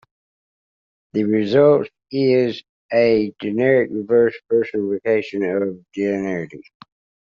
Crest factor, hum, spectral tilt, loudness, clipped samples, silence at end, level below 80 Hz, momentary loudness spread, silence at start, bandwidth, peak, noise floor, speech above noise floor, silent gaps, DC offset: 16 dB; none; -5.5 dB/octave; -19 LUFS; under 0.1%; 0.65 s; -62 dBFS; 11 LU; 1.15 s; 7 kHz; -2 dBFS; under -90 dBFS; over 72 dB; 2.69-2.89 s; under 0.1%